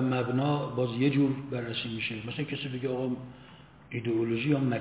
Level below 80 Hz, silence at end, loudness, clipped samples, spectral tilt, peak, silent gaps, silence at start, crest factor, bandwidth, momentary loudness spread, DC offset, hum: -64 dBFS; 0 s; -30 LUFS; under 0.1%; -6 dB/octave; -14 dBFS; none; 0 s; 16 dB; 4 kHz; 9 LU; under 0.1%; none